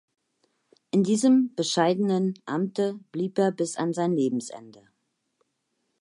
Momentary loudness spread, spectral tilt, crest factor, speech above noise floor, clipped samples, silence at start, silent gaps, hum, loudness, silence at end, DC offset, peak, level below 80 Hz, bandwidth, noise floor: 9 LU; -5.5 dB/octave; 18 dB; 52 dB; under 0.1%; 0.95 s; none; none; -25 LUFS; 1.3 s; under 0.1%; -8 dBFS; -78 dBFS; 11.5 kHz; -77 dBFS